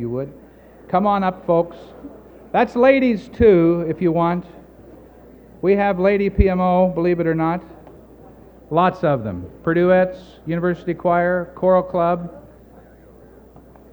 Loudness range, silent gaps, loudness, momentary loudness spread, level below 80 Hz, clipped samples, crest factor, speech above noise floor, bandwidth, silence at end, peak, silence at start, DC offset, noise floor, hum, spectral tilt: 3 LU; none; -18 LUFS; 13 LU; -36 dBFS; under 0.1%; 18 dB; 28 dB; over 20 kHz; 1.5 s; 0 dBFS; 0 s; under 0.1%; -45 dBFS; none; -9.5 dB/octave